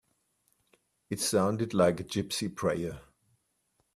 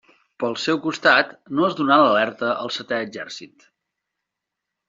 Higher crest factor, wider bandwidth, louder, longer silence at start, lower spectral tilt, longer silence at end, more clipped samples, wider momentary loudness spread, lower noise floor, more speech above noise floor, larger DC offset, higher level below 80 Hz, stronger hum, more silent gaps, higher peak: about the same, 22 dB vs 20 dB; first, 15 kHz vs 7.8 kHz; second, -30 LUFS vs -20 LUFS; first, 1.1 s vs 0.4 s; first, -4.5 dB/octave vs -2 dB/octave; second, 0.95 s vs 1.4 s; neither; about the same, 12 LU vs 14 LU; second, -76 dBFS vs -83 dBFS; second, 46 dB vs 62 dB; neither; first, -62 dBFS vs -68 dBFS; neither; neither; second, -10 dBFS vs -2 dBFS